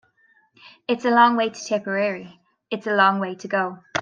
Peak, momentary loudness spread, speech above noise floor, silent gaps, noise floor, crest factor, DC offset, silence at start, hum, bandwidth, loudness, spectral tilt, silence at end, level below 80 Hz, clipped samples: -2 dBFS; 14 LU; 40 dB; none; -61 dBFS; 20 dB; under 0.1%; 0.9 s; none; 9.2 kHz; -21 LUFS; -4.5 dB/octave; 0 s; -72 dBFS; under 0.1%